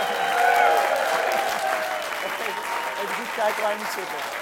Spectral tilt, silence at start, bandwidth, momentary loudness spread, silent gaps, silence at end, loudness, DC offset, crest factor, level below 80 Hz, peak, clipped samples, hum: -1 dB/octave; 0 s; 17 kHz; 9 LU; none; 0 s; -23 LUFS; under 0.1%; 18 dB; -66 dBFS; -6 dBFS; under 0.1%; none